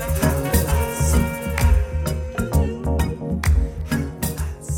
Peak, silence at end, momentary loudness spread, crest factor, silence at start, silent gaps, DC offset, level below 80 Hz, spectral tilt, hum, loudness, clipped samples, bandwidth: -4 dBFS; 0 s; 6 LU; 16 dB; 0 s; none; under 0.1%; -24 dBFS; -5.5 dB/octave; none; -22 LUFS; under 0.1%; 18 kHz